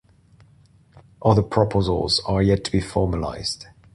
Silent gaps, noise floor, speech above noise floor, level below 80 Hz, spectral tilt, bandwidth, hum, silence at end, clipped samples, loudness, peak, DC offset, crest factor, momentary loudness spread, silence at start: none; -54 dBFS; 34 dB; -38 dBFS; -6 dB/octave; 11.5 kHz; none; 0.3 s; under 0.1%; -21 LUFS; -4 dBFS; under 0.1%; 20 dB; 8 LU; 0.95 s